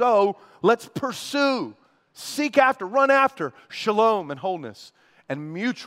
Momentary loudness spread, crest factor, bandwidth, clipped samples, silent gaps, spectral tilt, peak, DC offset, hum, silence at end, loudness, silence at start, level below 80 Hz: 14 LU; 20 dB; 16 kHz; under 0.1%; none; -4.5 dB/octave; -4 dBFS; under 0.1%; none; 0 s; -23 LUFS; 0 s; -76 dBFS